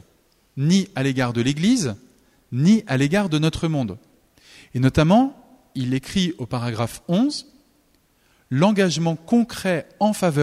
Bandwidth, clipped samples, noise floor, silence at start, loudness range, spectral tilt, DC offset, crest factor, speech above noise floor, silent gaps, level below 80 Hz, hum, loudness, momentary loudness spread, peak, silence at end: 15 kHz; under 0.1%; -61 dBFS; 0.55 s; 3 LU; -6 dB/octave; under 0.1%; 16 dB; 41 dB; none; -48 dBFS; none; -21 LUFS; 11 LU; -4 dBFS; 0 s